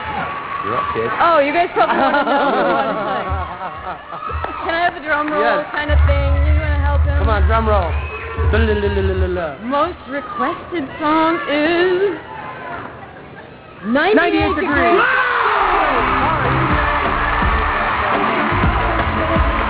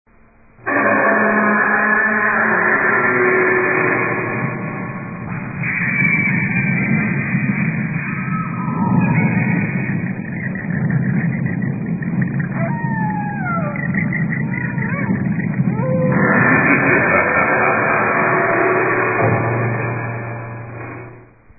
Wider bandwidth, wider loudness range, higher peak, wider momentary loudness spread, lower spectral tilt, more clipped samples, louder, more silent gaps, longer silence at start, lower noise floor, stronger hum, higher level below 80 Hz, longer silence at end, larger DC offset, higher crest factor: first, 4 kHz vs 2.7 kHz; about the same, 4 LU vs 6 LU; about the same, -2 dBFS vs -2 dBFS; first, 13 LU vs 10 LU; second, -10 dB/octave vs -16 dB/octave; neither; about the same, -17 LUFS vs -17 LUFS; neither; second, 0 s vs 0.6 s; second, -36 dBFS vs -48 dBFS; neither; first, -24 dBFS vs -48 dBFS; second, 0 s vs 0.35 s; neither; about the same, 14 dB vs 16 dB